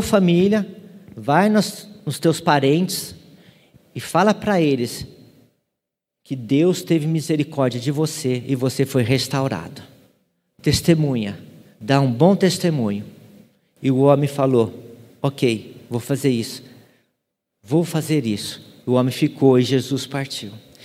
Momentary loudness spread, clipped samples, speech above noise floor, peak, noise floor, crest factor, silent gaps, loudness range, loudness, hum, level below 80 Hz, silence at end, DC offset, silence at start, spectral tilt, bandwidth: 15 LU; under 0.1%; 63 dB; 0 dBFS; -82 dBFS; 20 dB; none; 4 LU; -20 LUFS; none; -52 dBFS; 0.25 s; under 0.1%; 0 s; -6 dB/octave; 16 kHz